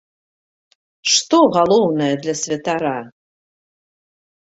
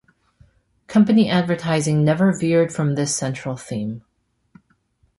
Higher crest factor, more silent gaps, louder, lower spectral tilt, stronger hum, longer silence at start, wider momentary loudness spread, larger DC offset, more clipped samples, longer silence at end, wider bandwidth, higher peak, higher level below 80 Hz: about the same, 18 dB vs 16 dB; neither; about the same, -17 LUFS vs -19 LUFS; second, -3.5 dB/octave vs -6 dB/octave; neither; first, 1.05 s vs 0.9 s; about the same, 10 LU vs 12 LU; neither; neither; about the same, 1.3 s vs 1.2 s; second, 8.2 kHz vs 11.5 kHz; first, -2 dBFS vs -6 dBFS; about the same, -62 dBFS vs -58 dBFS